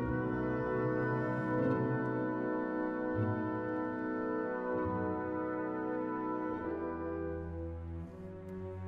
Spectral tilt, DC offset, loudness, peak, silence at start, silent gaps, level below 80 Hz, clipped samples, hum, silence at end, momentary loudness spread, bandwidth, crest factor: -10 dB/octave; under 0.1%; -36 LUFS; -22 dBFS; 0 s; none; -56 dBFS; under 0.1%; none; 0 s; 9 LU; 5.2 kHz; 14 dB